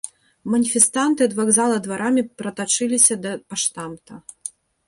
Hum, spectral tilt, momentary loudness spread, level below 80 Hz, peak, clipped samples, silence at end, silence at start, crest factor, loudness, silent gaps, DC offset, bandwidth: none; -2.5 dB/octave; 19 LU; -66 dBFS; 0 dBFS; under 0.1%; 0.4 s; 0.05 s; 20 dB; -18 LUFS; none; under 0.1%; 12 kHz